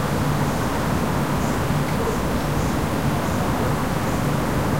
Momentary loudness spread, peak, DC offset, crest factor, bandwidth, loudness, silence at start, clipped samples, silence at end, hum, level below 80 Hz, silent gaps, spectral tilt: 1 LU; -10 dBFS; 2%; 12 dB; 16 kHz; -22 LUFS; 0 s; under 0.1%; 0 s; none; -32 dBFS; none; -6 dB/octave